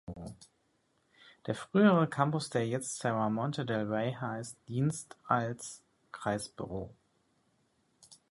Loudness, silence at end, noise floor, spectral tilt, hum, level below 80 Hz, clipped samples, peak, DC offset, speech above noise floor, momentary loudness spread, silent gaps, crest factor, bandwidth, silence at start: -33 LUFS; 0.15 s; -74 dBFS; -6 dB/octave; none; -64 dBFS; under 0.1%; -12 dBFS; under 0.1%; 42 dB; 19 LU; none; 22 dB; 11.5 kHz; 0.05 s